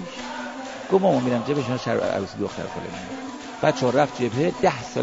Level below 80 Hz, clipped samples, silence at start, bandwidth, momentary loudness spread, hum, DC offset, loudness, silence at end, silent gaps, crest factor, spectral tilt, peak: -58 dBFS; under 0.1%; 0 s; 8 kHz; 13 LU; none; 0.1%; -24 LUFS; 0 s; none; 20 dB; -6 dB/octave; -4 dBFS